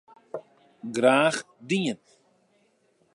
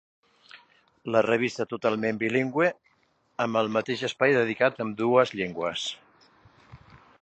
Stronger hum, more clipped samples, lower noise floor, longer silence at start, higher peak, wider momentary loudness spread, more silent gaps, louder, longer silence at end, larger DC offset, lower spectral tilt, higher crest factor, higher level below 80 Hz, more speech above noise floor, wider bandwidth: neither; neither; about the same, -67 dBFS vs -68 dBFS; second, 0.35 s vs 0.55 s; about the same, -6 dBFS vs -6 dBFS; first, 21 LU vs 9 LU; neither; about the same, -25 LUFS vs -26 LUFS; first, 1.2 s vs 0.45 s; neither; about the same, -4.5 dB/octave vs -5 dB/octave; about the same, 22 dB vs 22 dB; second, -78 dBFS vs -68 dBFS; about the same, 42 dB vs 42 dB; first, 11.5 kHz vs 8.6 kHz